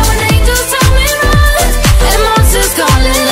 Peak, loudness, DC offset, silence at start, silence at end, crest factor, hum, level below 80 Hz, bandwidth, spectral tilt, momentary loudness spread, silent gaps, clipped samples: 0 dBFS; -9 LUFS; under 0.1%; 0 s; 0 s; 8 dB; none; -12 dBFS; 16.5 kHz; -3.5 dB/octave; 1 LU; none; under 0.1%